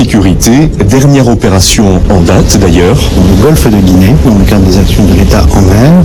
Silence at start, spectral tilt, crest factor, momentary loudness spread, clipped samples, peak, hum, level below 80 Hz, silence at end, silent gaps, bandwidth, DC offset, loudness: 0 s; -6 dB/octave; 4 dB; 2 LU; 10%; 0 dBFS; none; -12 dBFS; 0 s; none; 20 kHz; under 0.1%; -5 LUFS